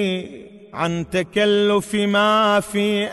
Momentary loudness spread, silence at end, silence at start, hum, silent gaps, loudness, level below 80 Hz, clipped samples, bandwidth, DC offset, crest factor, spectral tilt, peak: 11 LU; 0 s; 0 s; none; none; -19 LUFS; -52 dBFS; under 0.1%; 12 kHz; under 0.1%; 14 dB; -5 dB/octave; -6 dBFS